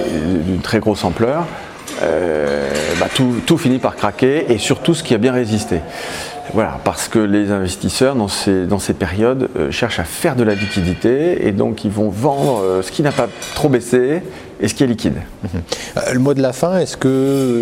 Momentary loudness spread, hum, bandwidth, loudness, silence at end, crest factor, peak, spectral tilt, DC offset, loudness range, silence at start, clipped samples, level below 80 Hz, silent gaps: 7 LU; none; 16.5 kHz; -17 LUFS; 0 s; 16 dB; 0 dBFS; -5.5 dB/octave; under 0.1%; 2 LU; 0 s; under 0.1%; -40 dBFS; none